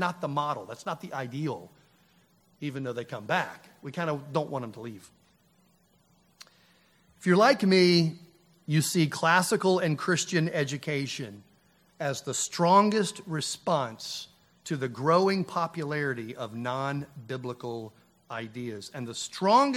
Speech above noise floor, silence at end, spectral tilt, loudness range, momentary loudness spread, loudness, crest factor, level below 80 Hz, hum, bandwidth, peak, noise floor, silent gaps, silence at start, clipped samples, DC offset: 38 dB; 0 s; -4.5 dB/octave; 10 LU; 17 LU; -28 LUFS; 22 dB; -74 dBFS; none; 15.5 kHz; -8 dBFS; -65 dBFS; none; 0 s; under 0.1%; under 0.1%